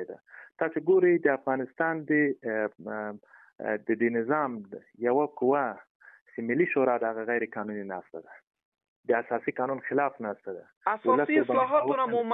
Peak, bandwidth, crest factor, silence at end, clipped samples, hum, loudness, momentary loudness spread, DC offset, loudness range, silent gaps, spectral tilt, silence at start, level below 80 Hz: -10 dBFS; 3.9 kHz; 18 dB; 0 s; under 0.1%; none; -28 LUFS; 16 LU; under 0.1%; 4 LU; 5.90-6.00 s, 6.21-6.26 s, 8.43-8.51 s, 8.65-8.72 s, 8.88-9.03 s, 10.77-10.81 s; -10 dB/octave; 0 s; -80 dBFS